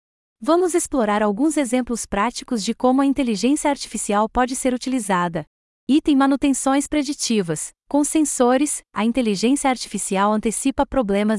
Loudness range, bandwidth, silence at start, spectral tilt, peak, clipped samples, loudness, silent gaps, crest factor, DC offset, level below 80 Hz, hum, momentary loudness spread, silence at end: 1 LU; 12 kHz; 0.4 s; -4 dB/octave; -4 dBFS; under 0.1%; -20 LUFS; 5.47-5.87 s; 16 dB; under 0.1%; -46 dBFS; none; 6 LU; 0 s